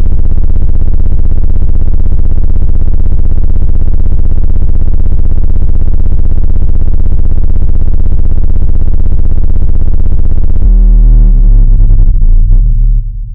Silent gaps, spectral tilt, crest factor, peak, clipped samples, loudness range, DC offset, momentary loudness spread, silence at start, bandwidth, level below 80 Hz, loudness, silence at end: none; -12 dB/octave; 4 dB; 0 dBFS; 40%; 3 LU; 40%; 5 LU; 0 s; 1.1 kHz; -4 dBFS; -13 LUFS; 0 s